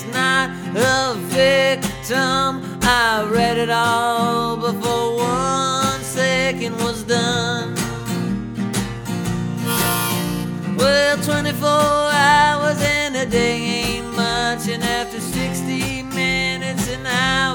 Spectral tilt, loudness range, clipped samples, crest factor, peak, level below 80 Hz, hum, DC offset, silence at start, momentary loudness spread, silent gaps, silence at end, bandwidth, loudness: -4 dB/octave; 5 LU; under 0.1%; 18 dB; -2 dBFS; -40 dBFS; none; under 0.1%; 0 s; 8 LU; none; 0 s; over 20 kHz; -18 LUFS